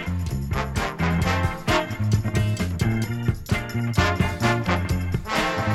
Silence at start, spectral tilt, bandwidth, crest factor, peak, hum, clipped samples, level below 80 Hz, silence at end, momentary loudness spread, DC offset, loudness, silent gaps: 0 s; -6 dB/octave; 15 kHz; 16 dB; -6 dBFS; none; under 0.1%; -34 dBFS; 0 s; 5 LU; under 0.1%; -24 LUFS; none